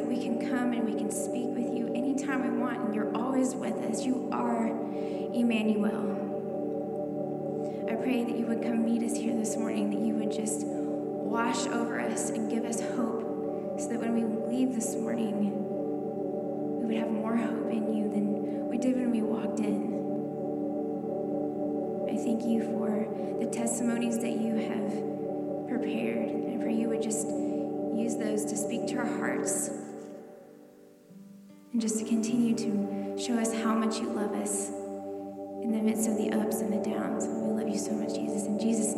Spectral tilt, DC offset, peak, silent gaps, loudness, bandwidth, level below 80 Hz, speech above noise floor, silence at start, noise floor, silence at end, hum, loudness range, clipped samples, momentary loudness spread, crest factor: -5 dB/octave; under 0.1%; -16 dBFS; none; -31 LUFS; 13.5 kHz; -74 dBFS; 25 dB; 0 s; -54 dBFS; 0 s; none; 2 LU; under 0.1%; 5 LU; 14 dB